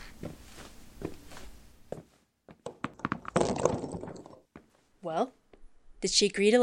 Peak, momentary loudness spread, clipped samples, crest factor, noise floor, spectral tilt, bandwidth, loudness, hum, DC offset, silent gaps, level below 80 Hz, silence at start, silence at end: -8 dBFS; 24 LU; under 0.1%; 26 dB; -59 dBFS; -3.5 dB/octave; 16 kHz; -31 LUFS; none; under 0.1%; none; -56 dBFS; 0 s; 0 s